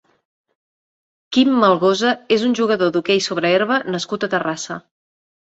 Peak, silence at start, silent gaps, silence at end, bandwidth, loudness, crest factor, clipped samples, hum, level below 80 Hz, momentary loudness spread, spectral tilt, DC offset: -2 dBFS; 1.3 s; none; 0.65 s; 8.2 kHz; -17 LUFS; 16 dB; under 0.1%; none; -64 dBFS; 10 LU; -4.5 dB/octave; under 0.1%